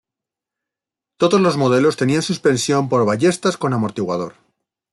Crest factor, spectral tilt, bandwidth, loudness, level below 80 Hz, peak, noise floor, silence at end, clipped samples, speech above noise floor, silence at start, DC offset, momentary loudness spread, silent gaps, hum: 16 dB; -5.5 dB/octave; 12 kHz; -17 LUFS; -60 dBFS; -4 dBFS; -87 dBFS; 0.6 s; under 0.1%; 70 dB; 1.2 s; under 0.1%; 7 LU; none; none